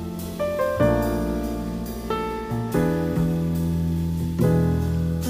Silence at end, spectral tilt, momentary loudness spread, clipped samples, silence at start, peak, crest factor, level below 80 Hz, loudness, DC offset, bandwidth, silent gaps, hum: 0 s; -7.5 dB/octave; 7 LU; under 0.1%; 0 s; -6 dBFS; 16 dB; -34 dBFS; -24 LUFS; under 0.1%; 16 kHz; none; none